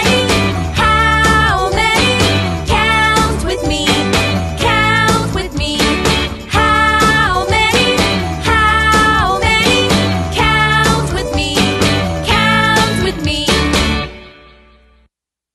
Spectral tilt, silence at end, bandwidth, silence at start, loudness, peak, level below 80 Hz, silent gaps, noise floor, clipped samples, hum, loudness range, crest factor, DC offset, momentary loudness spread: -4 dB/octave; 1.25 s; 12.5 kHz; 0 s; -12 LUFS; 0 dBFS; -24 dBFS; none; -63 dBFS; under 0.1%; none; 2 LU; 14 dB; under 0.1%; 6 LU